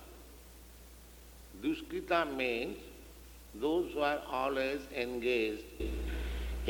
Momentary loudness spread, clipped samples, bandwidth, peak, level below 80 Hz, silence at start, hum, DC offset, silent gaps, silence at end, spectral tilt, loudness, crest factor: 22 LU; under 0.1%; 19.5 kHz; -14 dBFS; -46 dBFS; 0 s; none; under 0.1%; none; 0 s; -5.5 dB/octave; -35 LUFS; 22 dB